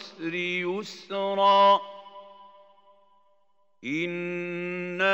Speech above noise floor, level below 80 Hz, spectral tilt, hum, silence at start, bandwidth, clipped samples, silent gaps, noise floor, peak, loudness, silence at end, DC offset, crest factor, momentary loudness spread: 45 dB; -88 dBFS; -5 dB/octave; none; 0 s; 8 kHz; under 0.1%; none; -71 dBFS; -8 dBFS; -26 LUFS; 0 s; under 0.1%; 18 dB; 19 LU